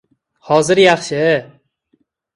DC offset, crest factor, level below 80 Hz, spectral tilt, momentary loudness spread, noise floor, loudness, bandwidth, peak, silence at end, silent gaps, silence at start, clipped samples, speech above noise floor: under 0.1%; 16 dB; -56 dBFS; -4.5 dB/octave; 6 LU; -63 dBFS; -14 LUFS; 11.5 kHz; 0 dBFS; 0.9 s; none; 0.45 s; under 0.1%; 50 dB